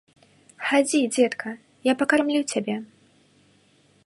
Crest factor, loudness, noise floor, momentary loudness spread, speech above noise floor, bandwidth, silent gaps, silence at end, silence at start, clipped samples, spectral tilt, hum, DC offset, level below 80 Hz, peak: 20 dB; -23 LUFS; -60 dBFS; 12 LU; 38 dB; 11.5 kHz; none; 1.2 s; 0.6 s; under 0.1%; -3 dB/octave; none; under 0.1%; -72 dBFS; -6 dBFS